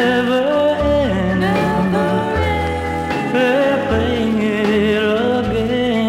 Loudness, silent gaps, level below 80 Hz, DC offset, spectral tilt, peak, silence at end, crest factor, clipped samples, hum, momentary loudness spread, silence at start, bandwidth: -16 LUFS; none; -34 dBFS; under 0.1%; -6.5 dB/octave; -4 dBFS; 0 s; 12 dB; under 0.1%; none; 3 LU; 0 s; 16 kHz